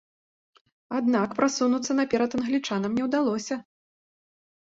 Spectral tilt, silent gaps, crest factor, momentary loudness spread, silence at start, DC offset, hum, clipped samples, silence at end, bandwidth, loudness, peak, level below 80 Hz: -4.5 dB/octave; none; 18 dB; 7 LU; 0.9 s; under 0.1%; none; under 0.1%; 1.05 s; 7.8 kHz; -26 LUFS; -8 dBFS; -66 dBFS